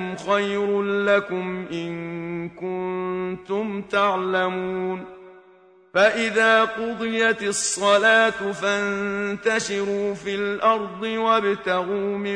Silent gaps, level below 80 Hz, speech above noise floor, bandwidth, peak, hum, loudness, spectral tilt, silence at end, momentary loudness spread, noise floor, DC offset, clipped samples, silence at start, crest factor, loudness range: none; -62 dBFS; 30 dB; 10.5 kHz; -4 dBFS; none; -22 LUFS; -3.5 dB/octave; 0 s; 12 LU; -53 dBFS; under 0.1%; under 0.1%; 0 s; 18 dB; 6 LU